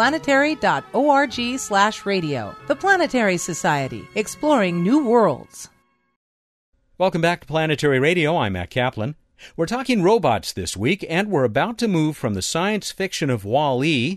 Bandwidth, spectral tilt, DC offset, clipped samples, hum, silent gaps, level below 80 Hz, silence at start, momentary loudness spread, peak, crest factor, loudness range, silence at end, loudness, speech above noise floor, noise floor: 13.5 kHz; -5 dB/octave; under 0.1%; under 0.1%; none; 6.16-6.73 s; -52 dBFS; 0 s; 9 LU; -4 dBFS; 16 dB; 2 LU; 0 s; -20 LUFS; over 70 dB; under -90 dBFS